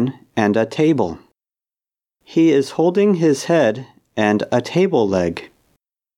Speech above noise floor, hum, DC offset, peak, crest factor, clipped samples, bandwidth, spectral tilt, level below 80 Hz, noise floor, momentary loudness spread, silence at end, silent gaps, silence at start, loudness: over 74 dB; none; under 0.1%; 0 dBFS; 18 dB; under 0.1%; 12.5 kHz; -6.5 dB/octave; -60 dBFS; under -90 dBFS; 9 LU; 0.7 s; none; 0 s; -17 LUFS